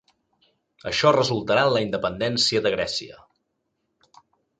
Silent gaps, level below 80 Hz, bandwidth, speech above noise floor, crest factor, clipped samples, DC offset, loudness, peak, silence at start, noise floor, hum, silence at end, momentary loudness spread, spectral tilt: none; -56 dBFS; 9.4 kHz; 54 dB; 20 dB; under 0.1%; under 0.1%; -22 LUFS; -4 dBFS; 0.85 s; -76 dBFS; none; 1.45 s; 10 LU; -4 dB/octave